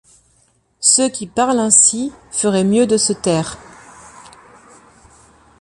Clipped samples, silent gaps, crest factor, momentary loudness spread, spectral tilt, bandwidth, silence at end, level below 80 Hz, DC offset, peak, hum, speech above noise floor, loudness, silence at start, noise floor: under 0.1%; none; 18 dB; 13 LU; -3 dB/octave; 11.5 kHz; 1.5 s; -52 dBFS; under 0.1%; 0 dBFS; none; 43 dB; -14 LUFS; 0.8 s; -58 dBFS